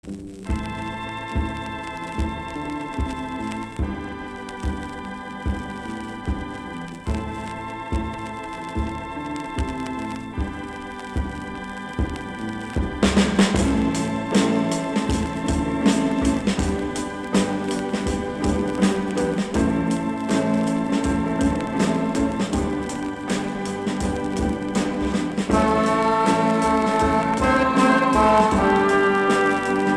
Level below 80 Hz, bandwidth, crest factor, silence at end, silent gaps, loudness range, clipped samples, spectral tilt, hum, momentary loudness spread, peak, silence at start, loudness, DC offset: -34 dBFS; 12.5 kHz; 20 dB; 0 s; none; 11 LU; under 0.1%; -5.5 dB/octave; none; 13 LU; -2 dBFS; 0.05 s; -23 LUFS; under 0.1%